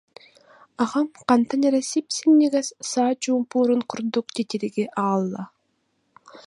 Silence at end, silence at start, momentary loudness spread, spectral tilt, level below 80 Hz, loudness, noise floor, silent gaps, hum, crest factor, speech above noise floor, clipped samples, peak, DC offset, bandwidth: 0.1 s; 0.8 s; 9 LU; -4.5 dB/octave; -74 dBFS; -22 LUFS; -71 dBFS; none; none; 18 dB; 49 dB; under 0.1%; -4 dBFS; under 0.1%; 11.5 kHz